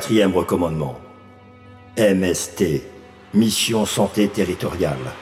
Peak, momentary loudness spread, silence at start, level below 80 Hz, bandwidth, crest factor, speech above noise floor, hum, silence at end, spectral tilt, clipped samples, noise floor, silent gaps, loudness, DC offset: -6 dBFS; 10 LU; 0 s; -46 dBFS; 16.5 kHz; 16 dB; 25 dB; none; 0 s; -4.5 dB/octave; under 0.1%; -45 dBFS; none; -20 LUFS; under 0.1%